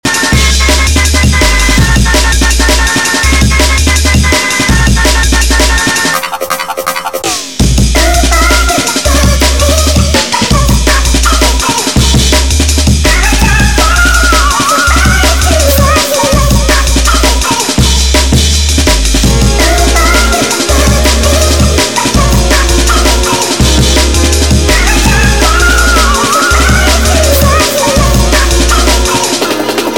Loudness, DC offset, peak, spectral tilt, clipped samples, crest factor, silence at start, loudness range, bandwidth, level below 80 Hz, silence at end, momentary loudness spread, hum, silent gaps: -7 LUFS; 2%; 0 dBFS; -3.5 dB/octave; 0.8%; 8 dB; 0.05 s; 2 LU; 18.5 kHz; -10 dBFS; 0 s; 2 LU; none; none